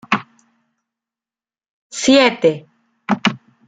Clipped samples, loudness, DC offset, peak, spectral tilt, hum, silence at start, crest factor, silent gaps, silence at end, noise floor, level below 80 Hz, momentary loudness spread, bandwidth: under 0.1%; -16 LUFS; under 0.1%; -2 dBFS; -4 dB/octave; none; 0.1 s; 18 dB; 1.69-1.90 s; 0.3 s; under -90 dBFS; -60 dBFS; 19 LU; 9.4 kHz